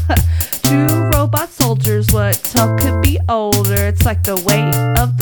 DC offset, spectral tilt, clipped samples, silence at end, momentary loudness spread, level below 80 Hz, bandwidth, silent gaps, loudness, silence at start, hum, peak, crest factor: under 0.1%; -5 dB/octave; under 0.1%; 0 s; 2 LU; -24 dBFS; 19.5 kHz; none; -14 LUFS; 0 s; none; 0 dBFS; 14 dB